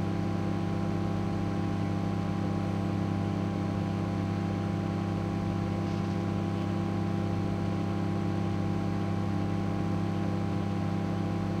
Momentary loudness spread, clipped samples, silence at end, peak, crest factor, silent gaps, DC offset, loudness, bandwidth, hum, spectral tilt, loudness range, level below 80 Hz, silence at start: 1 LU; under 0.1%; 0 s; -18 dBFS; 12 dB; none; under 0.1%; -31 LUFS; 9.4 kHz; none; -8 dB/octave; 0 LU; -50 dBFS; 0 s